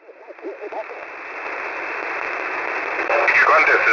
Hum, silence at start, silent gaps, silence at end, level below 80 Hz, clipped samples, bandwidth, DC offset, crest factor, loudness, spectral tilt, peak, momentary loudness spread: none; 0.1 s; none; 0 s; -62 dBFS; under 0.1%; 6 kHz; under 0.1%; 14 dB; -18 LUFS; -2.5 dB/octave; -6 dBFS; 19 LU